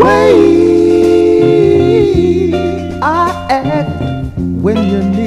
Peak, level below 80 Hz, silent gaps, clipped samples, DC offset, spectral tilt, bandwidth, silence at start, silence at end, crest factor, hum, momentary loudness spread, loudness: 0 dBFS; -32 dBFS; none; 0.4%; under 0.1%; -7.5 dB/octave; 11 kHz; 0 s; 0 s; 10 dB; none; 10 LU; -10 LUFS